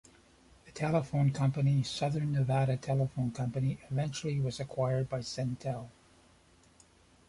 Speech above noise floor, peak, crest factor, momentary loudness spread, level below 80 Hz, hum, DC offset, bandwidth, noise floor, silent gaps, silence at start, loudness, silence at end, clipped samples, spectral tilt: 32 dB; -16 dBFS; 18 dB; 7 LU; -60 dBFS; none; under 0.1%; 11.5 kHz; -63 dBFS; none; 0.65 s; -33 LUFS; 1.4 s; under 0.1%; -7 dB/octave